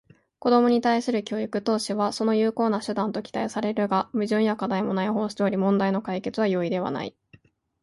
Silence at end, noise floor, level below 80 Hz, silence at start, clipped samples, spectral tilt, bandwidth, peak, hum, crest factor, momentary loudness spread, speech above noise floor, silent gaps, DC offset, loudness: 0.7 s; -57 dBFS; -66 dBFS; 0.45 s; under 0.1%; -6 dB/octave; 11.5 kHz; -8 dBFS; none; 16 dB; 7 LU; 33 dB; none; under 0.1%; -25 LUFS